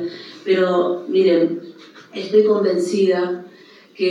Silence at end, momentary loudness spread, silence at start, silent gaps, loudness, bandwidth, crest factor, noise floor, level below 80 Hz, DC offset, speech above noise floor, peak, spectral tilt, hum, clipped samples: 0 s; 15 LU; 0 s; none; -18 LUFS; 10.5 kHz; 16 dB; -46 dBFS; -90 dBFS; under 0.1%; 29 dB; -4 dBFS; -6 dB/octave; none; under 0.1%